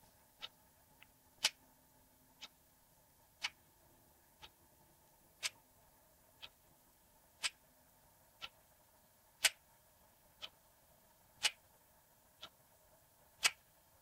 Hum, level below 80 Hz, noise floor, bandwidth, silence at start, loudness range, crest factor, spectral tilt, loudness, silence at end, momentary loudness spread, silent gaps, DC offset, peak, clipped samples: none; -80 dBFS; -70 dBFS; 16 kHz; 0.4 s; 10 LU; 34 dB; 2 dB/octave; -40 LUFS; 0.5 s; 26 LU; none; under 0.1%; -14 dBFS; under 0.1%